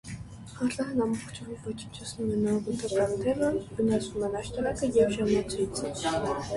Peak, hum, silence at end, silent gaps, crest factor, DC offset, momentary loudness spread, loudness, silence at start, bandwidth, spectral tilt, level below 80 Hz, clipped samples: -12 dBFS; none; 0 s; none; 16 dB; under 0.1%; 13 LU; -29 LUFS; 0.05 s; 11.5 kHz; -5.5 dB/octave; -50 dBFS; under 0.1%